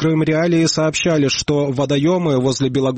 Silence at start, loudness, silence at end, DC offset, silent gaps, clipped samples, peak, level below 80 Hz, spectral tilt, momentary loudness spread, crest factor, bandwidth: 0 s; -16 LUFS; 0 s; under 0.1%; none; under 0.1%; -6 dBFS; -46 dBFS; -5 dB/octave; 3 LU; 10 dB; 8.8 kHz